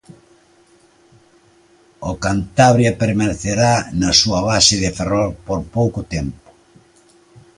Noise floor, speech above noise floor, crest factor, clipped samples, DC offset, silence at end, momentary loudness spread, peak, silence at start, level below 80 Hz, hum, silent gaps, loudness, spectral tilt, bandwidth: -52 dBFS; 36 dB; 18 dB; under 0.1%; under 0.1%; 1.25 s; 13 LU; 0 dBFS; 2 s; -38 dBFS; none; none; -16 LUFS; -4 dB/octave; 11.5 kHz